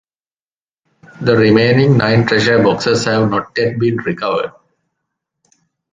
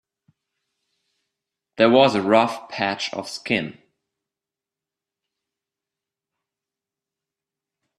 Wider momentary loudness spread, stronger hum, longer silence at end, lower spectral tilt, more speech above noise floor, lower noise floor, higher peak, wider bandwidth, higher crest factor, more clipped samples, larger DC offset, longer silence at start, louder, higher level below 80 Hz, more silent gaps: second, 8 LU vs 12 LU; neither; second, 1.45 s vs 4.3 s; about the same, -6 dB/octave vs -5 dB/octave; first, over 77 dB vs 69 dB; about the same, under -90 dBFS vs -89 dBFS; about the same, 0 dBFS vs -2 dBFS; second, 9.4 kHz vs 12.5 kHz; second, 14 dB vs 24 dB; neither; neither; second, 1.2 s vs 1.8 s; first, -13 LUFS vs -20 LUFS; first, -48 dBFS vs -66 dBFS; neither